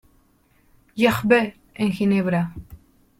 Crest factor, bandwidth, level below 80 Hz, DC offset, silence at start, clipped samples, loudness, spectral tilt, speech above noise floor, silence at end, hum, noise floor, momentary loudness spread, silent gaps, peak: 20 dB; 16.5 kHz; -52 dBFS; under 0.1%; 0.95 s; under 0.1%; -21 LUFS; -6.5 dB/octave; 40 dB; 0.45 s; none; -60 dBFS; 13 LU; none; -4 dBFS